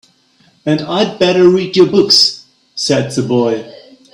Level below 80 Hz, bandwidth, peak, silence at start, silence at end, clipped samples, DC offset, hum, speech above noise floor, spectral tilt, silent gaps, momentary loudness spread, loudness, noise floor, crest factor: -54 dBFS; 15.5 kHz; 0 dBFS; 0.65 s; 0.35 s; under 0.1%; under 0.1%; none; 41 dB; -4.5 dB/octave; none; 14 LU; -12 LUFS; -52 dBFS; 14 dB